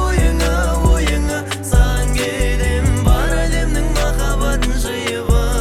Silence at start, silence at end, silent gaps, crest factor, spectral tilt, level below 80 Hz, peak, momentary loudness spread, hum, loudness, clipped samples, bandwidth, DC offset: 0 s; 0 s; none; 14 dB; -5 dB/octave; -16 dBFS; -2 dBFS; 4 LU; none; -17 LUFS; under 0.1%; 15.5 kHz; under 0.1%